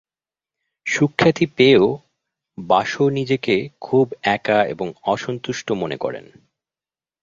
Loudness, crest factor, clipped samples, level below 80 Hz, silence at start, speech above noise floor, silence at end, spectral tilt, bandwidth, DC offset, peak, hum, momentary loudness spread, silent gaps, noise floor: -19 LUFS; 20 dB; under 0.1%; -56 dBFS; 0.85 s; over 71 dB; 1 s; -5.5 dB/octave; 7.6 kHz; under 0.1%; 0 dBFS; none; 12 LU; none; under -90 dBFS